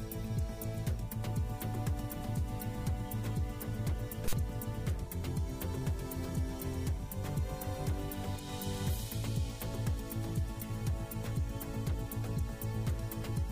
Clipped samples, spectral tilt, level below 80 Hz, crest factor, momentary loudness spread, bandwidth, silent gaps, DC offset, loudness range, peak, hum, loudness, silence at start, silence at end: under 0.1%; -6 dB/octave; -42 dBFS; 14 dB; 2 LU; 16 kHz; none; under 0.1%; 0 LU; -20 dBFS; none; -38 LUFS; 0 s; 0 s